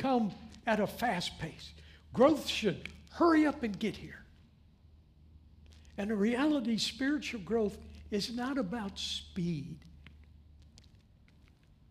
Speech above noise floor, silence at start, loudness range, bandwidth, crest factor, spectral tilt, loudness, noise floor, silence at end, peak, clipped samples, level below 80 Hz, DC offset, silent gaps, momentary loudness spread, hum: 30 dB; 0 s; 7 LU; 15.5 kHz; 22 dB; -5 dB/octave; -33 LUFS; -62 dBFS; 1.65 s; -14 dBFS; under 0.1%; -58 dBFS; under 0.1%; none; 20 LU; none